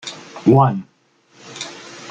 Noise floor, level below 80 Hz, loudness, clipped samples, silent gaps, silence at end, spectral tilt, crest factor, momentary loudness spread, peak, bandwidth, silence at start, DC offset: -55 dBFS; -56 dBFS; -16 LUFS; under 0.1%; none; 0 s; -7 dB/octave; 18 dB; 21 LU; -2 dBFS; 9 kHz; 0.05 s; under 0.1%